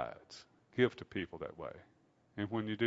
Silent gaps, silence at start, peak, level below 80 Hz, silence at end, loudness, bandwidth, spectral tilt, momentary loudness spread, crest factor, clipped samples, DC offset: none; 0 s; -16 dBFS; -70 dBFS; 0 s; -39 LUFS; 7.6 kHz; -4.5 dB/octave; 20 LU; 22 dB; under 0.1%; under 0.1%